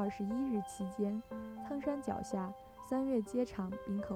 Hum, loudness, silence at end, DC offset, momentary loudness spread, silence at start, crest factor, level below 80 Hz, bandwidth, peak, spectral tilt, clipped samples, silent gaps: none; -39 LUFS; 0 s; under 0.1%; 8 LU; 0 s; 14 dB; -64 dBFS; 15 kHz; -24 dBFS; -7 dB/octave; under 0.1%; none